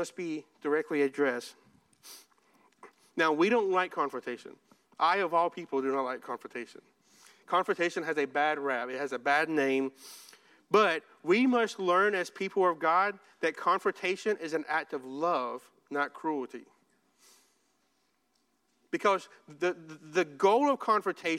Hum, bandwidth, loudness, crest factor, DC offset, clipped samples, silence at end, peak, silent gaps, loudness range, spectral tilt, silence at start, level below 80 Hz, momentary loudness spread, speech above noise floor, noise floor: none; 14.5 kHz; -30 LUFS; 20 dB; under 0.1%; under 0.1%; 0 s; -12 dBFS; none; 8 LU; -4.5 dB/octave; 0 s; -88 dBFS; 14 LU; 45 dB; -75 dBFS